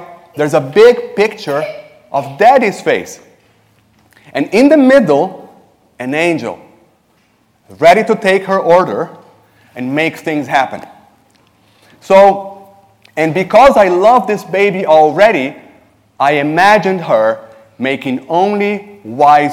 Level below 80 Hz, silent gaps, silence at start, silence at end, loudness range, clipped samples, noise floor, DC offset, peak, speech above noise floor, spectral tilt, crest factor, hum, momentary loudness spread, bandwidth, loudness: -50 dBFS; none; 0 s; 0 s; 5 LU; 0.6%; -55 dBFS; under 0.1%; 0 dBFS; 44 dB; -5.5 dB/octave; 12 dB; none; 16 LU; 16 kHz; -11 LUFS